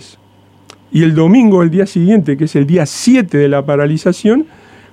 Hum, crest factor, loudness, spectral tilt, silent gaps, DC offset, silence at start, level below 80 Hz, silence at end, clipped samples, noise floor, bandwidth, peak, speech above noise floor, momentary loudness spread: none; 12 dB; -11 LUFS; -7 dB/octave; none; under 0.1%; 0.9 s; -54 dBFS; 0.5 s; under 0.1%; -46 dBFS; 13 kHz; 0 dBFS; 36 dB; 6 LU